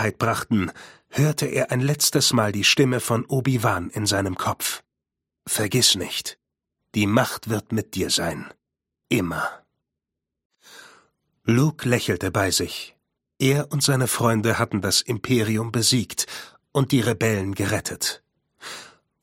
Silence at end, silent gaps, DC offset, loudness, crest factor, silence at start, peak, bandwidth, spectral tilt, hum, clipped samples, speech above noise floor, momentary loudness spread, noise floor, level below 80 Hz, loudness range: 0.35 s; 10.45-10.50 s; under 0.1%; -22 LUFS; 22 dB; 0 s; -2 dBFS; 16.5 kHz; -4 dB/octave; none; under 0.1%; 63 dB; 13 LU; -85 dBFS; -54 dBFS; 6 LU